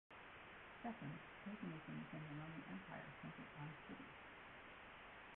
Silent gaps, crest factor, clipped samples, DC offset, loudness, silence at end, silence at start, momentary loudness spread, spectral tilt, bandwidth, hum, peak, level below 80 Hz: none; 16 dB; under 0.1%; under 0.1%; -55 LUFS; 0 s; 0.1 s; 7 LU; -5 dB/octave; 4 kHz; none; -38 dBFS; -76 dBFS